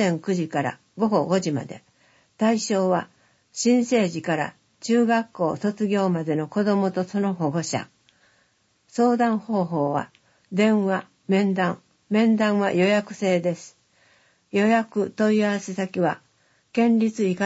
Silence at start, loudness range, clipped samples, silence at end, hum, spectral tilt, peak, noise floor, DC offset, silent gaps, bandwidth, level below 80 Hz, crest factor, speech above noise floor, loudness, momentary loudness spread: 0 s; 3 LU; under 0.1%; 0 s; none; -6 dB/octave; -8 dBFS; -65 dBFS; under 0.1%; none; 8 kHz; -70 dBFS; 16 dB; 43 dB; -23 LUFS; 10 LU